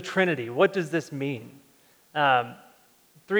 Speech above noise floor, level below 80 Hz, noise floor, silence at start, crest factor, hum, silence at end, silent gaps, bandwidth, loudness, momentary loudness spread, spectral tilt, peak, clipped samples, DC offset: 34 dB; -78 dBFS; -60 dBFS; 0 s; 20 dB; none; 0 s; none; over 20 kHz; -25 LUFS; 12 LU; -5.5 dB/octave; -8 dBFS; under 0.1%; under 0.1%